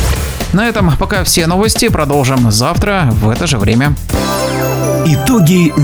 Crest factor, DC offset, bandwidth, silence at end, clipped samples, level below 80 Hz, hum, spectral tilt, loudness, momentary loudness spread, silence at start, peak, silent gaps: 10 dB; under 0.1%; over 20 kHz; 0 s; under 0.1%; -22 dBFS; none; -5 dB/octave; -11 LUFS; 5 LU; 0 s; 0 dBFS; none